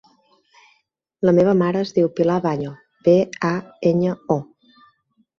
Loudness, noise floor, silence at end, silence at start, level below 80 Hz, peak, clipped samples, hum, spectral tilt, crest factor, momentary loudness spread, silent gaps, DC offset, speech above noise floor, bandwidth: -19 LUFS; -65 dBFS; 0.95 s; 1.2 s; -60 dBFS; -4 dBFS; under 0.1%; none; -8 dB/octave; 18 dB; 8 LU; none; under 0.1%; 47 dB; 7 kHz